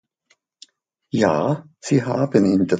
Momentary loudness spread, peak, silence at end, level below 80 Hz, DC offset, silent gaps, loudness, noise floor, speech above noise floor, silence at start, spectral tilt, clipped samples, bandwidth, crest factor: 9 LU; -2 dBFS; 0 s; -56 dBFS; under 0.1%; none; -20 LUFS; -65 dBFS; 46 dB; 1.15 s; -7 dB/octave; under 0.1%; 9.2 kHz; 18 dB